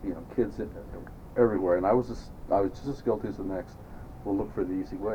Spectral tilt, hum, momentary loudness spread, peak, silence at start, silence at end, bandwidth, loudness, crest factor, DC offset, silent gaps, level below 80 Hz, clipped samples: -8.5 dB/octave; none; 18 LU; -10 dBFS; 0 s; 0 s; 19 kHz; -30 LUFS; 20 dB; under 0.1%; none; -46 dBFS; under 0.1%